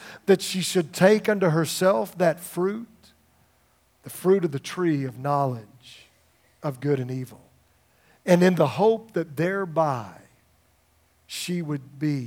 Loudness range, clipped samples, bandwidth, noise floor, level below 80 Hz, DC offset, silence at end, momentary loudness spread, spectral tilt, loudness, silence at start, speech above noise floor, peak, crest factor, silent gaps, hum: 6 LU; under 0.1%; 17 kHz; -64 dBFS; -72 dBFS; under 0.1%; 0 s; 14 LU; -5.5 dB/octave; -24 LUFS; 0 s; 40 dB; -2 dBFS; 22 dB; none; none